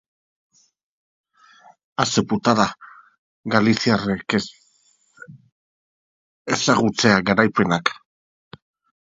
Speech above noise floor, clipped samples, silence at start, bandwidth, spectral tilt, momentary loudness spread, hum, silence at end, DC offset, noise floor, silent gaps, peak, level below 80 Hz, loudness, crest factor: 43 dB; under 0.1%; 2 s; 7.8 kHz; -4.5 dB/octave; 17 LU; none; 1.05 s; under 0.1%; -61 dBFS; 3.18-3.43 s, 5.52-6.45 s; 0 dBFS; -56 dBFS; -19 LUFS; 22 dB